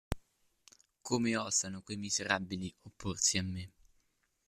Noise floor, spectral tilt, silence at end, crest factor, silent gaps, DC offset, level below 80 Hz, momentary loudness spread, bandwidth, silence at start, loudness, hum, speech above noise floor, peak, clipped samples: -76 dBFS; -2.5 dB/octave; 0.8 s; 26 dB; none; under 0.1%; -54 dBFS; 15 LU; 14.5 kHz; 0.1 s; -34 LUFS; none; 41 dB; -12 dBFS; under 0.1%